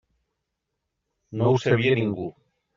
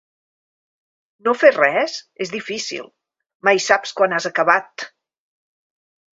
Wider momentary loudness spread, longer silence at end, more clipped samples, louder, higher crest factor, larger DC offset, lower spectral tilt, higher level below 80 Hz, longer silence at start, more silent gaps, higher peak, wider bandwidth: about the same, 15 LU vs 15 LU; second, 0.45 s vs 1.25 s; neither; second, -23 LUFS vs -18 LUFS; about the same, 18 dB vs 22 dB; neither; first, -6 dB/octave vs -2.5 dB/octave; first, -62 dBFS vs -68 dBFS; about the same, 1.3 s vs 1.25 s; second, none vs 3.35-3.40 s; second, -8 dBFS vs 0 dBFS; about the same, 7.4 kHz vs 7.8 kHz